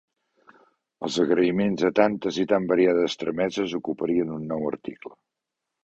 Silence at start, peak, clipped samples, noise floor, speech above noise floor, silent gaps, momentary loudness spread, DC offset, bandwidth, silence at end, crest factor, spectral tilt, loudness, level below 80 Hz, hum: 1 s; -4 dBFS; under 0.1%; -84 dBFS; 61 dB; none; 13 LU; under 0.1%; 8 kHz; 0.75 s; 20 dB; -6 dB/octave; -24 LUFS; -62 dBFS; none